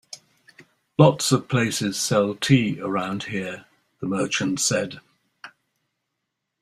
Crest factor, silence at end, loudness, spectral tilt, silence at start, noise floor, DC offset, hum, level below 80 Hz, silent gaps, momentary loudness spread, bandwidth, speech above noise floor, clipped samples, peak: 22 dB; 1.15 s; -22 LUFS; -4.5 dB/octave; 0.15 s; -80 dBFS; under 0.1%; none; -60 dBFS; none; 16 LU; 15 kHz; 58 dB; under 0.1%; -2 dBFS